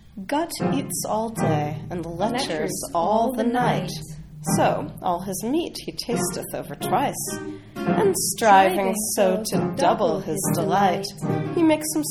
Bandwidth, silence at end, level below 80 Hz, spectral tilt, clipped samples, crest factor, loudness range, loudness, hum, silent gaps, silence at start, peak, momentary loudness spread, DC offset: 18.5 kHz; 0 s; -50 dBFS; -4.5 dB/octave; under 0.1%; 20 dB; 5 LU; -23 LUFS; none; none; 0.15 s; -4 dBFS; 10 LU; under 0.1%